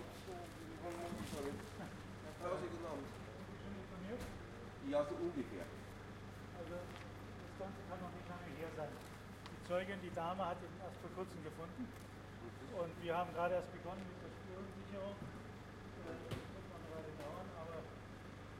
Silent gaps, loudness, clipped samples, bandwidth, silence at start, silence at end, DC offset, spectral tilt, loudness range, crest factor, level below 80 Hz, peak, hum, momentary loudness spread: none; -48 LUFS; under 0.1%; 16 kHz; 0 s; 0 s; under 0.1%; -6 dB/octave; 5 LU; 20 dB; -64 dBFS; -26 dBFS; none; 11 LU